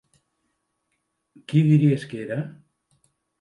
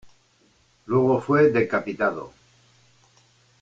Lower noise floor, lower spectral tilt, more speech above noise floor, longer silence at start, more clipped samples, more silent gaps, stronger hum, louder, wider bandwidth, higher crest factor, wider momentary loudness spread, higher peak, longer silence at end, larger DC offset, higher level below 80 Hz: first, -75 dBFS vs -62 dBFS; about the same, -9 dB/octave vs -8.5 dB/octave; first, 55 dB vs 41 dB; first, 1.5 s vs 0.05 s; neither; neither; neither; about the same, -22 LUFS vs -22 LUFS; first, 10.5 kHz vs 7.8 kHz; about the same, 18 dB vs 18 dB; about the same, 13 LU vs 12 LU; about the same, -6 dBFS vs -8 dBFS; second, 0.9 s vs 1.35 s; neither; second, -68 dBFS vs -62 dBFS